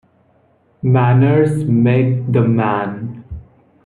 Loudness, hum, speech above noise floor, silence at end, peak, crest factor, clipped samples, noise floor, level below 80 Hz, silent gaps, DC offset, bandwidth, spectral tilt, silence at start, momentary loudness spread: -15 LUFS; none; 42 dB; 0.45 s; -2 dBFS; 14 dB; under 0.1%; -55 dBFS; -46 dBFS; none; under 0.1%; 10.5 kHz; -9.5 dB/octave; 0.85 s; 18 LU